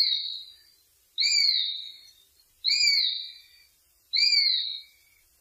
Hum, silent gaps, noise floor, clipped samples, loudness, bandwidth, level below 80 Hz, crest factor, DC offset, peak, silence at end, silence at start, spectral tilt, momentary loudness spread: none; none; -64 dBFS; under 0.1%; -23 LUFS; 16 kHz; -76 dBFS; 16 dB; under 0.1%; -12 dBFS; 0.55 s; 0 s; 5.5 dB/octave; 19 LU